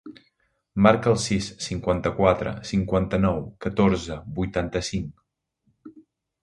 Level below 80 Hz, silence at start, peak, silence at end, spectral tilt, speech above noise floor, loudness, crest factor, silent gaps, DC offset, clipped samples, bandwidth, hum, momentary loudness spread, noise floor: -42 dBFS; 0.05 s; 0 dBFS; 0.4 s; -6 dB/octave; 47 dB; -24 LUFS; 24 dB; none; under 0.1%; under 0.1%; 11.5 kHz; none; 11 LU; -70 dBFS